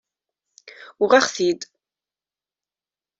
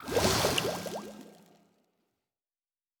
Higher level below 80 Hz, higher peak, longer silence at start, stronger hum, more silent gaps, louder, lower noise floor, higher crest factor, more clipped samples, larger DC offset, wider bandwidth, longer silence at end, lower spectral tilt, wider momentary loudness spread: second, -72 dBFS vs -52 dBFS; first, -2 dBFS vs -12 dBFS; first, 1 s vs 0 s; neither; neither; first, -19 LUFS vs -29 LUFS; about the same, under -90 dBFS vs under -90 dBFS; about the same, 22 dB vs 24 dB; neither; neither; second, 8 kHz vs over 20 kHz; about the same, 1.55 s vs 1.65 s; about the same, -2.5 dB/octave vs -3 dB/octave; second, 15 LU vs 21 LU